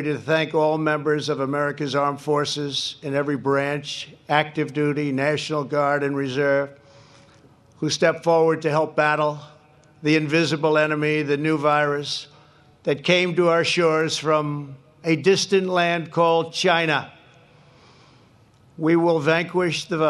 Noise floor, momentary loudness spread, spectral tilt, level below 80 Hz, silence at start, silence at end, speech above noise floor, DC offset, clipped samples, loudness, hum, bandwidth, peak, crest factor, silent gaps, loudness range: -54 dBFS; 7 LU; -5 dB/octave; -68 dBFS; 0 s; 0 s; 33 dB; under 0.1%; under 0.1%; -21 LUFS; none; 12.5 kHz; -2 dBFS; 20 dB; none; 3 LU